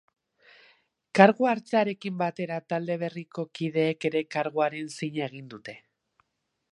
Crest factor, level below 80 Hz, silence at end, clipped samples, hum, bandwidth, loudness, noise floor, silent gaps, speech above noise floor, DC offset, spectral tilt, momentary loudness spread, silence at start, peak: 26 dB; -78 dBFS; 0.95 s; under 0.1%; none; 11.5 kHz; -27 LUFS; -77 dBFS; none; 51 dB; under 0.1%; -6.5 dB/octave; 17 LU; 1.15 s; -2 dBFS